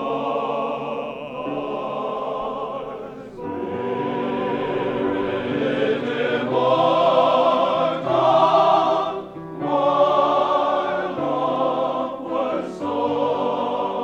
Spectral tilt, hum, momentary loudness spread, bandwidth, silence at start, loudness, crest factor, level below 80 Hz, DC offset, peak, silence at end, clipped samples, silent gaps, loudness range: -6.5 dB/octave; none; 12 LU; 8.6 kHz; 0 s; -21 LUFS; 16 dB; -58 dBFS; under 0.1%; -4 dBFS; 0 s; under 0.1%; none; 9 LU